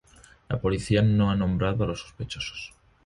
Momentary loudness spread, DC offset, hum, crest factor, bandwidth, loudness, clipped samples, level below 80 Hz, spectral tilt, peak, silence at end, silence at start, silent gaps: 14 LU; under 0.1%; none; 16 dB; 11.5 kHz; -26 LUFS; under 0.1%; -42 dBFS; -7 dB/octave; -10 dBFS; 0.4 s; 0.5 s; none